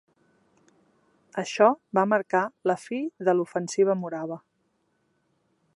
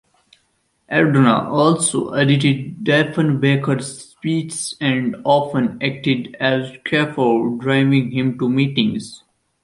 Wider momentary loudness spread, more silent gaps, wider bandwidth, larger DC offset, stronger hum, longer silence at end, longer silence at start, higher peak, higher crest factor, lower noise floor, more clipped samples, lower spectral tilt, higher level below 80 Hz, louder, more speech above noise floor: first, 13 LU vs 7 LU; neither; about the same, 11.5 kHz vs 11.5 kHz; neither; neither; first, 1.4 s vs 0.45 s; first, 1.35 s vs 0.9 s; second, -6 dBFS vs -2 dBFS; first, 22 dB vs 16 dB; first, -72 dBFS vs -65 dBFS; neither; about the same, -5.5 dB/octave vs -5.5 dB/octave; second, -80 dBFS vs -58 dBFS; second, -25 LUFS vs -18 LUFS; about the same, 47 dB vs 48 dB